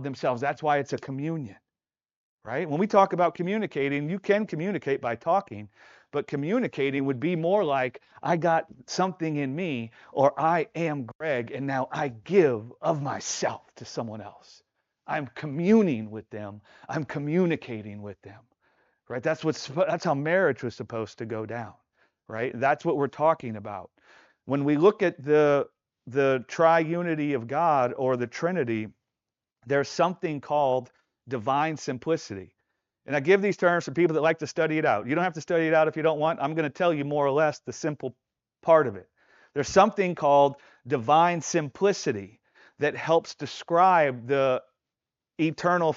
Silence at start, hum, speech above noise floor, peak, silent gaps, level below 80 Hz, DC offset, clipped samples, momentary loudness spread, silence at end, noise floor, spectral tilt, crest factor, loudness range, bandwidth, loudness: 0 s; none; over 64 dB; -6 dBFS; 2.16-2.38 s, 11.15-11.19 s; -70 dBFS; under 0.1%; under 0.1%; 14 LU; 0 s; under -90 dBFS; -5 dB/octave; 22 dB; 5 LU; 7.8 kHz; -26 LUFS